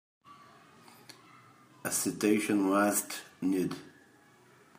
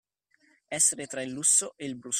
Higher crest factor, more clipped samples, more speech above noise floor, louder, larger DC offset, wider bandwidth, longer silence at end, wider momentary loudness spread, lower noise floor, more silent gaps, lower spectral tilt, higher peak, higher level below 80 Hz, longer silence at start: about the same, 18 dB vs 20 dB; neither; second, 31 dB vs 40 dB; second, -30 LUFS vs -24 LUFS; neither; about the same, 15.5 kHz vs 15 kHz; first, 0.9 s vs 0 s; first, 22 LU vs 15 LU; second, -61 dBFS vs -68 dBFS; neither; first, -4 dB/octave vs -1 dB/octave; second, -14 dBFS vs -10 dBFS; about the same, -80 dBFS vs -76 dBFS; second, 0.3 s vs 0.7 s